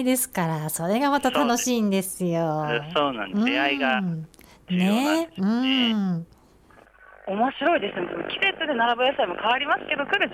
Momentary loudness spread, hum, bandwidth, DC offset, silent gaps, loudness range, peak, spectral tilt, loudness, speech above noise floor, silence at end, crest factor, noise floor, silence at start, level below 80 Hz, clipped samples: 7 LU; none; 16.5 kHz; under 0.1%; none; 2 LU; -10 dBFS; -4 dB/octave; -23 LUFS; 30 dB; 0 s; 14 dB; -54 dBFS; 0 s; -60 dBFS; under 0.1%